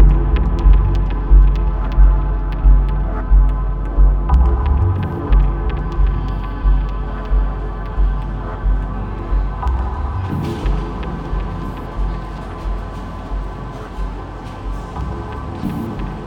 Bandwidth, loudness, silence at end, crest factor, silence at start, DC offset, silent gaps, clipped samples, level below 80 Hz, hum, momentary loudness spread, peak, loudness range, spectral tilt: 4.3 kHz; -20 LUFS; 0 s; 16 dB; 0 s; under 0.1%; none; under 0.1%; -16 dBFS; none; 12 LU; 0 dBFS; 10 LU; -9 dB/octave